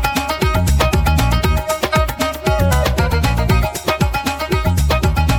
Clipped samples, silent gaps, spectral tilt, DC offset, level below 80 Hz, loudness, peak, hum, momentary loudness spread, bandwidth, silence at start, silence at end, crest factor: under 0.1%; none; -5 dB/octave; under 0.1%; -20 dBFS; -16 LUFS; -2 dBFS; none; 3 LU; 18.5 kHz; 0 s; 0 s; 12 dB